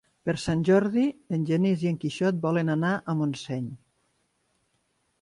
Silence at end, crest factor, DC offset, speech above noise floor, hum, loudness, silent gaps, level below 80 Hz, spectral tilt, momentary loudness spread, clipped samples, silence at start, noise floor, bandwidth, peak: 1.45 s; 16 dB; under 0.1%; 47 dB; none; -26 LUFS; none; -60 dBFS; -7 dB/octave; 10 LU; under 0.1%; 0.25 s; -73 dBFS; 11.5 kHz; -10 dBFS